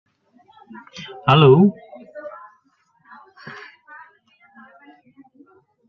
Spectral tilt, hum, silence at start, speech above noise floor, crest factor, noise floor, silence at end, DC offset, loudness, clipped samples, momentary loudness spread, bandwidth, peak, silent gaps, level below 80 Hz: -8.5 dB/octave; none; 1 s; 47 dB; 20 dB; -62 dBFS; 2.4 s; under 0.1%; -14 LUFS; under 0.1%; 29 LU; 6.4 kHz; -2 dBFS; none; -60 dBFS